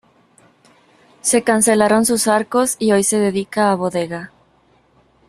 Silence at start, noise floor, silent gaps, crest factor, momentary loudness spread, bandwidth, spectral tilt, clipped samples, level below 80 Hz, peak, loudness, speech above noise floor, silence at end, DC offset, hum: 1.25 s; -56 dBFS; none; 16 dB; 9 LU; 14 kHz; -3.5 dB/octave; under 0.1%; -58 dBFS; -2 dBFS; -16 LUFS; 40 dB; 1 s; under 0.1%; none